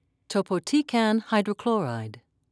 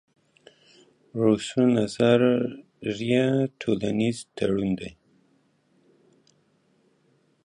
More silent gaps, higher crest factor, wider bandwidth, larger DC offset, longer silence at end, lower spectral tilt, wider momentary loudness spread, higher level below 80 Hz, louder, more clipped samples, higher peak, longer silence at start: neither; about the same, 18 dB vs 20 dB; about the same, 11 kHz vs 11 kHz; neither; second, 0.35 s vs 2.55 s; about the same, -5.5 dB/octave vs -6.5 dB/octave; second, 9 LU vs 12 LU; second, -74 dBFS vs -60 dBFS; about the same, -26 LUFS vs -24 LUFS; neither; about the same, -10 dBFS vs -8 dBFS; second, 0.3 s vs 1.15 s